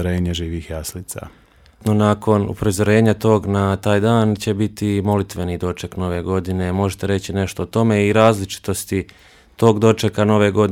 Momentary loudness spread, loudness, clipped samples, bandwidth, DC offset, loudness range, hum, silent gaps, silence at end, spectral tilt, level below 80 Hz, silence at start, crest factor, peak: 10 LU; -18 LUFS; under 0.1%; 16.5 kHz; under 0.1%; 4 LU; none; none; 0 s; -6.5 dB/octave; -42 dBFS; 0 s; 18 dB; 0 dBFS